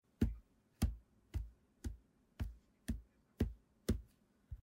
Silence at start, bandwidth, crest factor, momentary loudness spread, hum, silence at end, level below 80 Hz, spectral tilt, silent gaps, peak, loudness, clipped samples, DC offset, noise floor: 0.2 s; 16 kHz; 22 dB; 16 LU; none; 0.1 s; -48 dBFS; -7 dB/octave; none; -22 dBFS; -45 LUFS; under 0.1%; under 0.1%; -69 dBFS